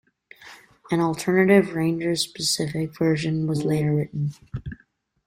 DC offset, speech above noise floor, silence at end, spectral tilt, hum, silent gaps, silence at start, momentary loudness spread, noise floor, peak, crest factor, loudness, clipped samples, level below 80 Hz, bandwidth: under 0.1%; 41 dB; 0.5 s; -5.5 dB/octave; none; none; 0.4 s; 12 LU; -63 dBFS; -4 dBFS; 18 dB; -23 LUFS; under 0.1%; -54 dBFS; 16 kHz